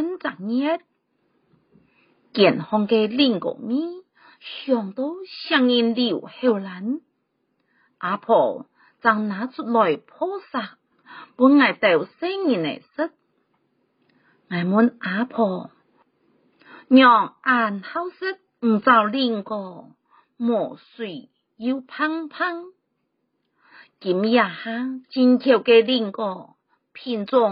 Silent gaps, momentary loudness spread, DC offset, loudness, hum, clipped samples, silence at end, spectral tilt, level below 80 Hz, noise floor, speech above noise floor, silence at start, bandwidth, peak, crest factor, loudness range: none; 16 LU; under 0.1%; -21 LUFS; none; under 0.1%; 0 s; -3 dB/octave; -74 dBFS; -74 dBFS; 53 dB; 0 s; 5.2 kHz; -2 dBFS; 20 dB; 6 LU